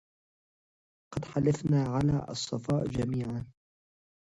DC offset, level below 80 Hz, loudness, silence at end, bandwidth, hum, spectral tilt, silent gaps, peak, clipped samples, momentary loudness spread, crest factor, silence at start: under 0.1%; -54 dBFS; -31 LUFS; 0.75 s; 10.5 kHz; none; -7 dB/octave; none; -16 dBFS; under 0.1%; 13 LU; 16 dB; 1.1 s